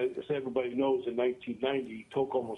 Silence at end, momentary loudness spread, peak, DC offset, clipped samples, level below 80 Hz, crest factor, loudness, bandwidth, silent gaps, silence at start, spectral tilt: 0 s; 5 LU; -18 dBFS; under 0.1%; under 0.1%; -72 dBFS; 14 dB; -32 LUFS; 4 kHz; none; 0 s; -7 dB/octave